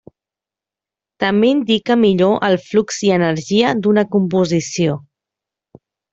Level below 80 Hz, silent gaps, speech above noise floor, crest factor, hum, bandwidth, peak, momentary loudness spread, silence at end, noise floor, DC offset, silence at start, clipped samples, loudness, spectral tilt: -56 dBFS; none; 73 dB; 14 dB; none; 8 kHz; -2 dBFS; 5 LU; 1.15 s; -88 dBFS; under 0.1%; 1.2 s; under 0.1%; -16 LUFS; -5.5 dB/octave